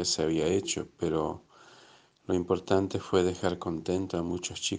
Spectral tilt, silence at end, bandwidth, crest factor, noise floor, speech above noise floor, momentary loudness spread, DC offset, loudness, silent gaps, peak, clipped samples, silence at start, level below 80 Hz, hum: -4.5 dB/octave; 0 s; 10 kHz; 20 dB; -58 dBFS; 29 dB; 7 LU; under 0.1%; -30 LUFS; none; -10 dBFS; under 0.1%; 0 s; -60 dBFS; none